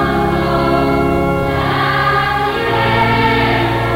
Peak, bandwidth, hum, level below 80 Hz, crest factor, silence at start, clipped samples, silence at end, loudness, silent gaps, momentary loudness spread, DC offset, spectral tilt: -2 dBFS; 16.5 kHz; none; -28 dBFS; 12 dB; 0 s; under 0.1%; 0 s; -14 LUFS; none; 3 LU; under 0.1%; -6.5 dB/octave